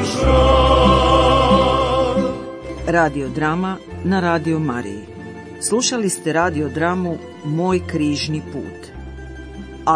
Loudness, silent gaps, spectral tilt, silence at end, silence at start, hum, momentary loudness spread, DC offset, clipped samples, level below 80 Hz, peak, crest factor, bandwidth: -17 LUFS; none; -5 dB/octave; 0 s; 0 s; none; 21 LU; under 0.1%; under 0.1%; -28 dBFS; -2 dBFS; 16 dB; 10.5 kHz